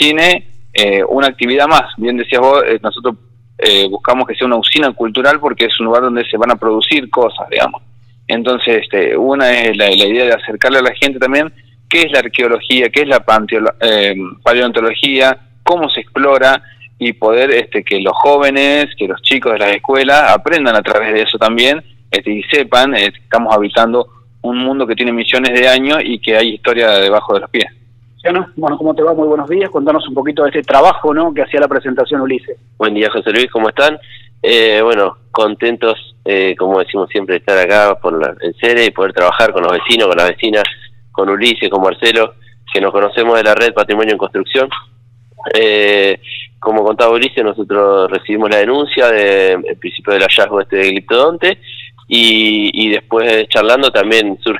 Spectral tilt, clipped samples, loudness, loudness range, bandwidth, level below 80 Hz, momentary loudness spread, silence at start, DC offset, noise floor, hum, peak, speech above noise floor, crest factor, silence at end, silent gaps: -3.5 dB/octave; 0.1%; -11 LUFS; 2 LU; 16 kHz; -48 dBFS; 8 LU; 0 s; under 0.1%; -39 dBFS; none; 0 dBFS; 28 dB; 12 dB; 0 s; none